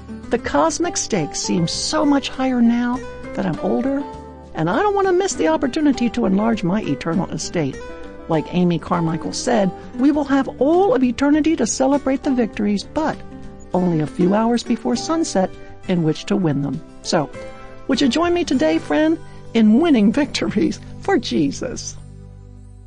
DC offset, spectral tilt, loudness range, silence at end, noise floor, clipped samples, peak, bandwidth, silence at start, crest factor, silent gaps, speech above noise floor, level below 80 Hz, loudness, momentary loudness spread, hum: under 0.1%; -5 dB/octave; 3 LU; 0.15 s; -39 dBFS; under 0.1%; -6 dBFS; 10.5 kHz; 0 s; 12 dB; none; 21 dB; -42 dBFS; -19 LUFS; 10 LU; none